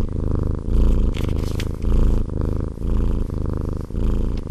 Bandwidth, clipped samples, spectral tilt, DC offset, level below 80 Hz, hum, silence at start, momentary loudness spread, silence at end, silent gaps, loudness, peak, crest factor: 8.6 kHz; under 0.1%; -8 dB/octave; under 0.1%; -20 dBFS; none; 0 s; 5 LU; 0 s; none; -24 LUFS; -6 dBFS; 14 dB